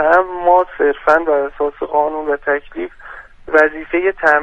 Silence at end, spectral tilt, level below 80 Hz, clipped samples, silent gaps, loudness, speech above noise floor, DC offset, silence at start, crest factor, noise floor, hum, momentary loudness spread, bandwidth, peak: 0 s; -5.5 dB/octave; -44 dBFS; under 0.1%; none; -15 LUFS; 19 dB; under 0.1%; 0 s; 16 dB; -34 dBFS; none; 15 LU; 8.4 kHz; 0 dBFS